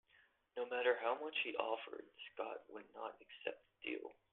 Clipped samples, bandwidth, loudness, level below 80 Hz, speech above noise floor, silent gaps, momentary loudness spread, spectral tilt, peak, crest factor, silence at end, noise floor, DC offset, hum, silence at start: under 0.1%; 4.1 kHz; -43 LUFS; -90 dBFS; 30 dB; none; 15 LU; 1 dB/octave; -20 dBFS; 24 dB; 0.2 s; -74 dBFS; under 0.1%; none; 0.55 s